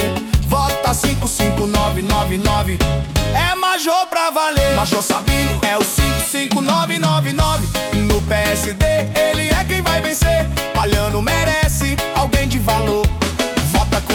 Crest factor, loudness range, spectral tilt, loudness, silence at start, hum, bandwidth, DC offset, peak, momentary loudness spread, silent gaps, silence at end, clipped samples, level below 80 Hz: 14 dB; 1 LU; -4.5 dB/octave; -16 LUFS; 0 s; none; 18 kHz; under 0.1%; -2 dBFS; 2 LU; none; 0 s; under 0.1%; -24 dBFS